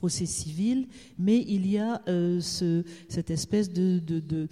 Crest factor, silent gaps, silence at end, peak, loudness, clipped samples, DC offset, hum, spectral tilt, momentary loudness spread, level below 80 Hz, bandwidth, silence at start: 14 dB; none; 0.05 s; -14 dBFS; -28 LUFS; under 0.1%; under 0.1%; none; -6 dB/octave; 6 LU; -56 dBFS; 13.5 kHz; 0 s